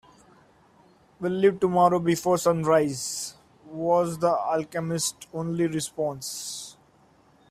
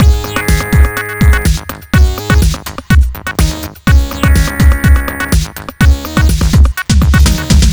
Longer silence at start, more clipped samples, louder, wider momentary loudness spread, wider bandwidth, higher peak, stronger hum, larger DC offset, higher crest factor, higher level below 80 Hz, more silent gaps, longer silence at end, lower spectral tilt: first, 1.2 s vs 0 s; second, under 0.1% vs 1%; second, -25 LUFS vs -11 LUFS; first, 12 LU vs 6 LU; second, 16 kHz vs over 20 kHz; second, -8 dBFS vs 0 dBFS; neither; neither; first, 18 dB vs 10 dB; second, -62 dBFS vs -12 dBFS; neither; first, 0.8 s vs 0 s; about the same, -5 dB/octave vs -5 dB/octave